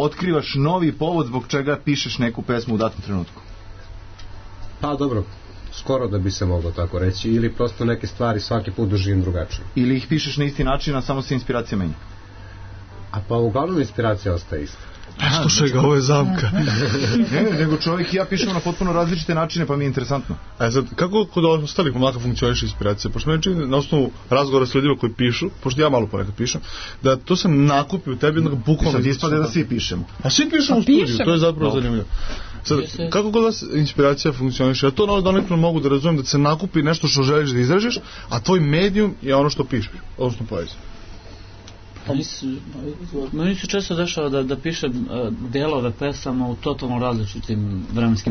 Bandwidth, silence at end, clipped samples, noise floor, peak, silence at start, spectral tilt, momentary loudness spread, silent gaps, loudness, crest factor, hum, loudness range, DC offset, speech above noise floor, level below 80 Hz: 6.6 kHz; 0 s; under 0.1%; -40 dBFS; -4 dBFS; 0 s; -5.5 dB/octave; 11 LU; none; -20 LUFS; 16 dB; none; 7 LU; under 0.1%; 20 dB; -36 dBFS